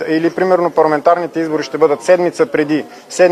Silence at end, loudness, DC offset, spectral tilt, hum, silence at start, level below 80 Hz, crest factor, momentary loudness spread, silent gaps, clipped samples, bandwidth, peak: 0 s; -14 LUFS; under 0.1%; -5.5 dB/octave; none; 0 s; -62 dBFS; 14 dB; 6 LU; none; under 0.1%; 13 kHz; 0 dBFS